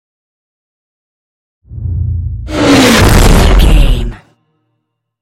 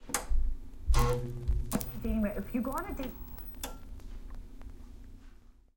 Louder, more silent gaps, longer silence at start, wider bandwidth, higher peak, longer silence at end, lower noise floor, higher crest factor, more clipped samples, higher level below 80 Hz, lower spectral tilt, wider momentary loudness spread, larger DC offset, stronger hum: first, -9 LUFS vs -35 LUFS; neither; first, 1.7 s vs 0 s; about the same, 17 kHz vs 17 kHz; first, 0 dBFS vs -12 dBFS; first, 1.05 s vs 0.25 s; first, -68 dBFS vs -54 dBFS; second, 10 dB vs 20 dB; first, 0.6% vs under 0.1%; first, -14 dBFS vs -36 dBFS; about the same, -5 dB/octave vs -5.5 dB/octave; second, 14 LU vs 20 LU; neither; neither